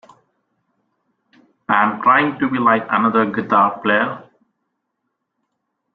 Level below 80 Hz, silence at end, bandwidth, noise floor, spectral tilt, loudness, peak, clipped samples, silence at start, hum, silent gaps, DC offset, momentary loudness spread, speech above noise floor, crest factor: -64 dBFS; 1.75 s; 4.8 kHz; -75 dBFS; -8 dB/octave; -16 LUFS; -2 dBFS; under 0.1%; 1.7 s; none; none; under 0.1%; 6 LU; 59 dB; 18 dB